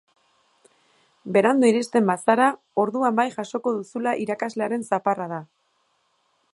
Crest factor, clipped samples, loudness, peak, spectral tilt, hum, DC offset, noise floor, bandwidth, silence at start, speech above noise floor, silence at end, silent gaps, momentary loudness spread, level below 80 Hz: 20 dB; under 0.1%; -22 LUFS; -4 dBFS; -5.5 dB/octave; none; under 0.1%; -68 dBFS; 11.5 kHz; 1.25 s; 46 dB; 1.1 s; none; 8 LU; -76 dBFS